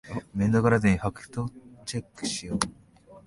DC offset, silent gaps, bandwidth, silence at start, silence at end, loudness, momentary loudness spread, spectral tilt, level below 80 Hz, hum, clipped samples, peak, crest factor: under 0.1%; none; 11.5 kHz; 0.05 s; 0.05 s; -27 LUFS; 13 LU; -5.5 dB/octave; -48 dBFS; none; under 0.1%; -2 dBFS; 24 dB